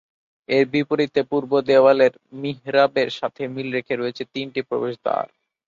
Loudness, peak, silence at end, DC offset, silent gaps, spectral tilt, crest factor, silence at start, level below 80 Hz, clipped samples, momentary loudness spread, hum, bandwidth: -21 LUFS; -4 dBFS; 0.4 s; under 0.1%; none; -6.5 dB/octave; 18 dB; 0.5 s; -66 dBFS; under 0.1%; 13 LU; none; 7.4 kHz